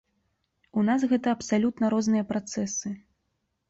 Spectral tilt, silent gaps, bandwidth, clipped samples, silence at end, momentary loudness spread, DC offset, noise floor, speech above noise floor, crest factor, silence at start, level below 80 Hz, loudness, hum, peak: -5 dB/octave; none; 8 kHz; under 0.1%; 0.7 s; 9 LU; under 0.1%; -77 dBFS; 52 dB; 14 dB; 0.75 s; -66 dBFS; -26 LUFS; none; -14 dBFS